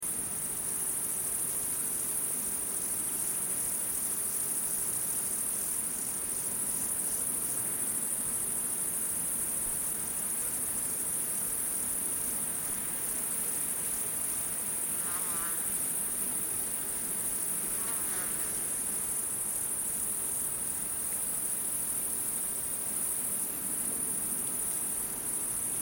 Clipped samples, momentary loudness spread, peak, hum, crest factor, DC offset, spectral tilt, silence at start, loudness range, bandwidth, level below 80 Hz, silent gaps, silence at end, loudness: under 0.1%; 2 LU; -18 dBFS; none; 16 dB; under 0.1%; -1 dB/octave; 0 s; 1 LU; 17 kHz; -60 dBFS; none; 0 s; -30 LUFS